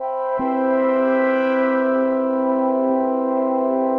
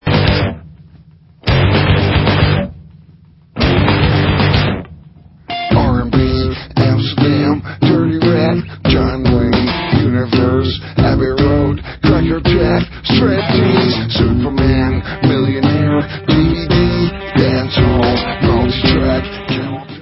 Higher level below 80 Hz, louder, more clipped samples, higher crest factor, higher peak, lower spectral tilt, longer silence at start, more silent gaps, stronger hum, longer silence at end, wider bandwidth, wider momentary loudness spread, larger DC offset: second, -64 dBFS vs -24 dBFS; second, -19 LUFS vs -14 LUFS; neither; about the same, 10 dB vs 14 dB; second, -8 dBFS vs 0 dBFS; second, -8 dB/octave vs -9.5 dB/octave; about the same, 0 s vs 0.05 s; neither; neither; about the same, 0 s vs 0 s; second, 4.9 kHz vs 5.8 kHz; second, 2 LU vs 6 LU; neither